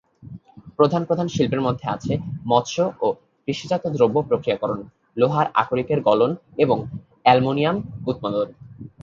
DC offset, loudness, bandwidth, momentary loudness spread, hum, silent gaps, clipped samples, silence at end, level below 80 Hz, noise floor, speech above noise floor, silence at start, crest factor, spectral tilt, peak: under 0.1%; -22 LUFS; 7.4 kHz; 15 LU; none; none; under 0.1%; 0.15 s; -54 dBFS; -42 dBFS; 21 dB; 0.25 s; 22 dB; -6.5 dB/octave; 0 dBFS